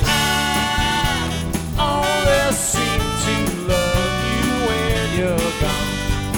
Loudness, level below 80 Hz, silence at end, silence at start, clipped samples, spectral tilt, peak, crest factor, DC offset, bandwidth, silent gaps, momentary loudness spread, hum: -19 LUFS; -28 dBFS; 0 s; 0 s; under 0.1%; -4 dB/octave; -4 dBFS; 16 dB; under 0.1%; over 20 kHz; none; 5 LU; none